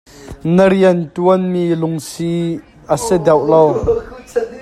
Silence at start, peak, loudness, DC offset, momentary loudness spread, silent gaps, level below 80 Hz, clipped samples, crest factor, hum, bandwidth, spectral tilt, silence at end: 0.2 s; 0 dBFS; -15 LUFS; under 0.1%; 11 LU; none; -40 dBFS; under 0.1%; 14 dB; none; 14 kHz; -6.5 dB/octave; 0 s